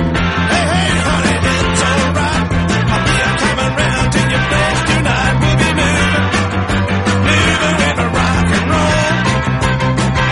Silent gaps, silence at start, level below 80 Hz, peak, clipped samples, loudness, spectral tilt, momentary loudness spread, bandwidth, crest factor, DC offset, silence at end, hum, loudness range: none; 0 s; -26 dBFS; 0 dBFS; under 0.1%; -13 LUFS; -5 dB/octave; 2 LU; 11.5 kHz; 14 dB; under 0.1%; 0 s; none; 1 LU